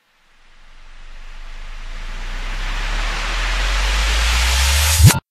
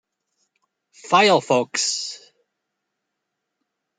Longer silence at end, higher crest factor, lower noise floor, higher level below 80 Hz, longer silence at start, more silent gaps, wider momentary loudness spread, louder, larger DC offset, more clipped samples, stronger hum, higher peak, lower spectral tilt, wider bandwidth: second, 0.1 s vs 1.8 s; about the same, 18 dB vs 22 dB; second, -51 dBFS vs -80 dBFS; first, -22 dBFS vs -76 dBFS; second, 0.7 s vs 1.05 s; neither; first, 24 LU vs 15 LU; about the same, -17 LUFS vs -19 LUFS; neither; neither; neither; about the same, 0 dBFS vs -2 dBFS; about the same, -3 dB/octave vs -2.5 dB/octave; first, 14.5 kHz vs 9.6 kHz